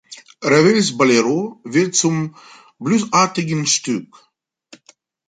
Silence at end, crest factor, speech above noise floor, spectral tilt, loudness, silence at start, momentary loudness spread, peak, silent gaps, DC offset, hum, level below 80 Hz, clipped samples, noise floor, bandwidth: 1.25 s; 16 dB; 37 dB; -4 dB/octave; -17 LUFS; 0.1 s; 11 LU; -2 dBFS; none; under 0.1%; none; -62 dBFS; under 0.1%; -54 dBFS; 9.6 kHz